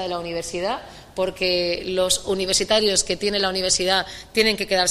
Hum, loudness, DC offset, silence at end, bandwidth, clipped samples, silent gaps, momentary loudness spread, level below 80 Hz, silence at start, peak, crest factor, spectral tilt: none; -21 LUFS; under 0.1%; 0 s; 15.5 kHz; under 0.1%; none; 9 LU; -46 dBFS; 0 s; -6 dBFS; 16 dB; -2 dB/octave